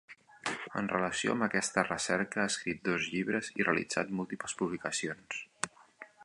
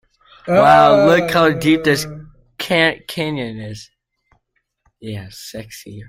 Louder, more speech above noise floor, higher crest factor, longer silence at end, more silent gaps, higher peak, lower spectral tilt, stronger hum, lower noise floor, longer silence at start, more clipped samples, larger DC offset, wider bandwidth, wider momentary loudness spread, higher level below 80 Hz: second, -33 LUFS vs -14 LUFS; second, 22 dB vs 53 dB; first, 24 dB vs 16 dB; about the same, 0 s vs 0.05 s; neither; second, -10 dBFS vs 0 dBFS; second, -3.5 dB/octave vs -5 dB/octave; neither; second, -55 dBFS vs -68 dBFS; second, 0.1 s vs 0.45 s; neither; neither; second, 11.5 kHz vs 16 kHz; second, 10 LU vs 23 LU; second, -68 dBFS vs -50 dBFS